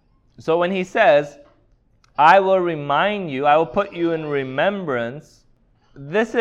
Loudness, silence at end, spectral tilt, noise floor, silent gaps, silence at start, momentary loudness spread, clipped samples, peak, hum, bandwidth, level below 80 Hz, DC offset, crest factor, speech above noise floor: -18 LUFS; 0 s; -6 dB/octave; -58 dBFS; none; 0.4 s; 12 LU; under 0.1%; 0 dBFS; none; 8.4 kHz; -56 dBFS; under 0.1%; 18 dB; 40 dB